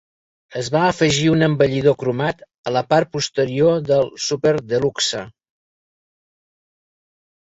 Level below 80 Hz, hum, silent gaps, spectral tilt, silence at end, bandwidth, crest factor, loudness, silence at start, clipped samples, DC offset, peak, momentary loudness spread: -54 dBFS; none; 2.58-2.64 s; -5 dB/octave; 2.25 s; 8 kHz; 18 dB; -18 LUFS; 0.5 s; under 0.1%; under 0.1%; -2 dBFS; 8 LU